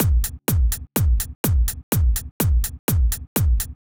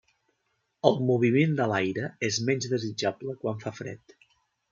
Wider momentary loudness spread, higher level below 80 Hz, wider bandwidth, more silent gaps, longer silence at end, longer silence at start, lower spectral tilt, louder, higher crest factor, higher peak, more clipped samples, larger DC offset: second, 2 LU vs 13 LU; first, -22 dBFS vs -72 dBFS; first, over 20 kHz vs 7.6 kHz; first, 1.35-1.44 s, 1.83-1.92 s, 2.31-2.40 s, 2.79-2.88 s, 3.27-3.36 s vs none; second, 0.1 s vs 0.75 s; second, 0 s vs 0.85 s; about the same, -5 dB/octave vs -5.5 dB/octave; first, -22 LUFS vs -27 LUFS; second, 14 dB vs 24 dB; about the same, -6 dBFS vs -4 dBFS; neither; neither